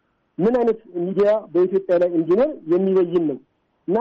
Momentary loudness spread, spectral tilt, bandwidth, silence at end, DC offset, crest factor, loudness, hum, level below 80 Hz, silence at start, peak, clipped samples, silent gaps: 8 LU; -9.5 dB/octave; 5.4 kHz; 0 s; under 0.1%; 10 dB; -20 LUFS; none; -58 dBFS; 0.4 s; -10 dBFS; under 0.1%; none